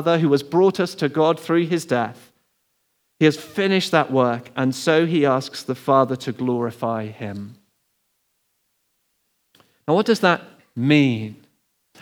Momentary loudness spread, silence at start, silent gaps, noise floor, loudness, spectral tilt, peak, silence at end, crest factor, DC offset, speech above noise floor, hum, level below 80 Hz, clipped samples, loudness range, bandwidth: 12 LU; 0 s; none; -70 dBFS; -20 LUFS; -6 dB/octave; 0 dBFS; 0.7 s; 20 dB; under 0.1%; 50 dB; none; -78 dBFS; under 0.1%; 9 LU; 19.5 kHz